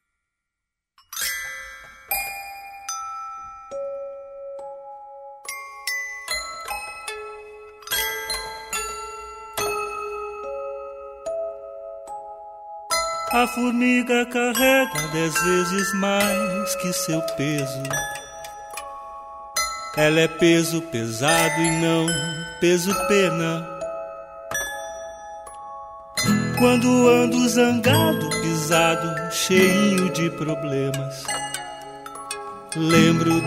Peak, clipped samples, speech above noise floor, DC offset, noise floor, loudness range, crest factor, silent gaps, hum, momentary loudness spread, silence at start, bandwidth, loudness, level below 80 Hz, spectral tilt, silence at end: -4 dBFS; under 0.1%; 64 dB; under 0.1%; -84 dBFS; 12 LU; 20 dB; none; none; 19 LU; 1.1 s; 16 kHz; -22 LUFS; -52 dBFS; -4 dB/octave; 0 s